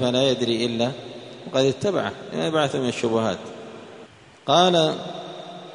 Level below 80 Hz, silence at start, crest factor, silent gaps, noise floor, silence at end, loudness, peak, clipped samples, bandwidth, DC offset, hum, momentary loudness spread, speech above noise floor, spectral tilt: -62 dBFS; 0 s; 20 dB; none; -47 dBFS; 0 s; -22 LUFS; -4 dBFS; under 0.1%; 10.5 kHz; under 0.1%; none; 20 LU; 25 dB; -5 dB/octave